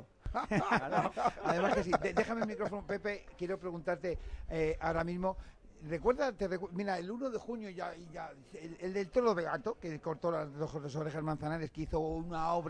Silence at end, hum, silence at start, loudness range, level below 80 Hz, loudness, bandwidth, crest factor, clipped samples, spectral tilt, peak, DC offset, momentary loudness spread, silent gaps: 0 s; none; 0 s; 4 LU; -52 dBFS; -36 LUFS; 10.5 kHz; 22 dB; under 0.1%; -6.5 dB/octave; -14 dBFS; under 0.1%; 11 LU; none